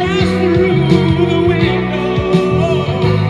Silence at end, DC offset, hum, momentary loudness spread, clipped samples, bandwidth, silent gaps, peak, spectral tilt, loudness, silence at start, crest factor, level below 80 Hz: 0 s; under 0.1%; none; 3 LU; under 0.1%; 10 kHz; none; 0 dBFS; -7.5 dB/octave; -13 LUFS; 0 s; 12 dB; -32 dBFS